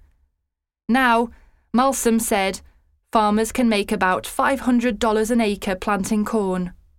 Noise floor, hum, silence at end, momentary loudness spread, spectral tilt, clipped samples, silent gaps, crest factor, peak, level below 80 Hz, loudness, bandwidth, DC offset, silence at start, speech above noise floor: -80 dBFS; none; 0.25 s; 6 LU; -4.5 dB/octave; under 0.1%; none; 18 dB; -4 dBFS; -44 dBFS; -20 LUFS; 17 kHz; under 0.1%; 0.9 s; 60 dB